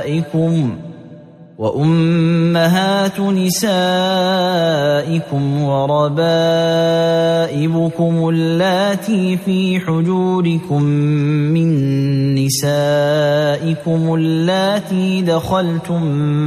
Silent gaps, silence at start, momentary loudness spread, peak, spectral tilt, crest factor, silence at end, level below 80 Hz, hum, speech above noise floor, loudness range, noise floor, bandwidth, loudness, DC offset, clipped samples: none; 0 s; 4 LU; -2 dBFS; -6 dB/octave; 12 dB; 0 s; -52 dBFS; none; 24 dB; 1 LU; -38 dBFS; 14.5 kHz; -15 LUFS; under 0.1%; under 0.1%